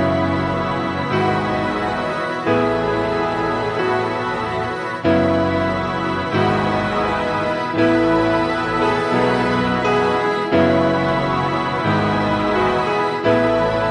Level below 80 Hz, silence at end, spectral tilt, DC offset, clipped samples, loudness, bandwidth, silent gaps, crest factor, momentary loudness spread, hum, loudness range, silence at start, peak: -42 dBFS; 0 s; -6.5 dB/octave; under 0.1%; under 0.1%; -18 LUFS; 11 kHz; none; 16 dB; 5 LU; none; 2 LU; 0 s; -2 dBFS